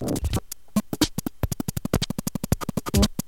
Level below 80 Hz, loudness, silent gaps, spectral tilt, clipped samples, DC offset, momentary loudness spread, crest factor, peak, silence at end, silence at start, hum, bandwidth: -34 dBFS; -27 LUFS; none; -5 dB/octave; under 0.1%; 0.8%; 7 LU; 20 dB; -6 dBFS; 0.05 s; 0 s; none; 17 kHz